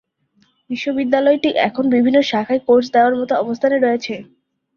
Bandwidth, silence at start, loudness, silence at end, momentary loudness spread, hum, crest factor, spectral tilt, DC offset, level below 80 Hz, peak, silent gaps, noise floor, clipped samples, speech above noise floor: 7 kHz; 0.7 s; -16 LUFS; 0.5 s; 9 LU; none; 16 dB; -5.5 dB/octave; under 0.1%; -60 dBFS; -2 dBFS; none; -60 dBFS; under 0.1%; 44 dB